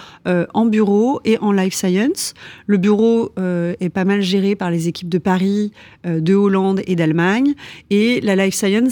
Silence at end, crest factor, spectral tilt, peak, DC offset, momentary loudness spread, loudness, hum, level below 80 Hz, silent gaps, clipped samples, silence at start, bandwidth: 0 s; 12 dB; -6 dB/octave; -4 dBFS; under 0.1%; 6 LU; -17 LUFS; none; -56 dBFS; none; under 0.1%; 0 s; over 20 kHz